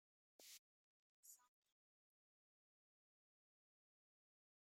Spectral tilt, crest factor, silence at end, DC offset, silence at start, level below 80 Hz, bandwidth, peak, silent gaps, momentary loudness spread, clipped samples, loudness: 2 dB/octave; 26 dB; 3.25 s; under 0.1%; 0.4 s; under -90 dBFS; 15 kHz; -50 dBFS; 0.59-1.23 s; 6 LU; under 0.1%; -65 LUFS